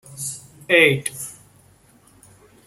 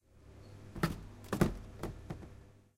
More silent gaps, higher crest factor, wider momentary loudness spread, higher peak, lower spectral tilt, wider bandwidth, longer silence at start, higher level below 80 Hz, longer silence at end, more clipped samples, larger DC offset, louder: neither; about the same, 22 dB vs 26 dB; about the same, 20 LU vs 22 LU; first, -2 dBFS vs -14 dBFS; second, -3.5 dB/octave vs -6.5 dB/octave; about the same, 16 kHz vs 16.5 kHz; about the same, 0.1 s vs 0.15 s; second, -62 dBFS vs -50 dBFS; first, 1.35 s vs 0.15 s; neither; neither; first, -18 LUFS vs -39 LUFS